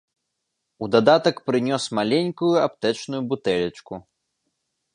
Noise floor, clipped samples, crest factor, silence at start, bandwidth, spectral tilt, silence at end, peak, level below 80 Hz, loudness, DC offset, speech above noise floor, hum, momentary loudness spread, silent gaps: -79 dBFS; under 0.1%; 20 dB; 0.8 s; 11 kHz; -5.5 dB/octave; 0.95 s; -2 dBFS; -62 dBFS; -22 LUFS; under 0.1%; 57 dB; none; 15 LU; none